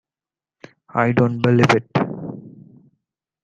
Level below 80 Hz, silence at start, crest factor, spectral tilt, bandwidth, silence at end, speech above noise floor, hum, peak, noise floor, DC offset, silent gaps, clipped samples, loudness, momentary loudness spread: -56 dBFS; 0.95 s; 20 dB; -7 dB/octave; 9 kHz; 0.95 s; over 74 dB; none; -2 dBFS; under -90 dBFS; under 0.1%; none; under 0.1%; -18 LUFS; 17 LU